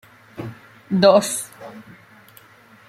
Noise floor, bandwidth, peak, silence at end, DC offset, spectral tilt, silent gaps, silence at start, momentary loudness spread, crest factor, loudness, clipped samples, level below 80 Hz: -49 dBFS; 15.5 kHz; 0 dBFS; 1.05 s; under 0.1%; -4.5 dB/octave; none; 0.35 s; 25 LU; 22 dB; -17 LUFS; under 0.1%; -64 dBFS